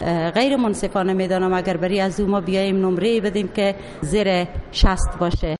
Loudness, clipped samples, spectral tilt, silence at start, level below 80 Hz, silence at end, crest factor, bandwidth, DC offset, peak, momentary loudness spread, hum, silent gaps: -20 LUFS; under 0.1%; -6 dB/octave; 0 s; -28 dBFS; 0.05 s; 16 dB; 11.5 kHz; under 0.1%; -4 dBFS; 4 LU; none; none